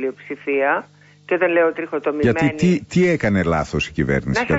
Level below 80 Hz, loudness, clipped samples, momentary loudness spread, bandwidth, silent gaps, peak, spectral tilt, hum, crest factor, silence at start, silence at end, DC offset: -40 dBFS; -19 LUFS; under 0.1%; 7 LU; 8 kHz; none; -6 dBFS; -6.5 dB/octave; none; 14 dB; 0 s; 0 s; under 0.1%